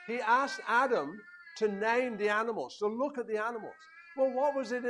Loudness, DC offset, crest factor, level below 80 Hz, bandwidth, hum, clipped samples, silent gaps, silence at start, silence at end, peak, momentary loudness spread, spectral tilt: -31 LUFS; under 0.1%; 18 dB; -82 dBFS; 11 kHz; none; under 0.1%; none; 0 s; 0 s; -14 dBFS; 15 LU; -4.5 dB/octave